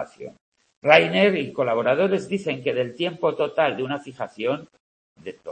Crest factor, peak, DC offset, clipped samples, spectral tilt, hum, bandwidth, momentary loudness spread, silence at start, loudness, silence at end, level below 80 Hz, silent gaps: 22 dB; 0 dBFS; under 0.1%; under 0.1%; -6 dB/octave; none; 8.8 kHz; 20 LU; 0 s; -22 LUFS; 0 s; -68 dBFS; 0.41-0.52 s, 0.77-0.82 s, 4.80-5.16 s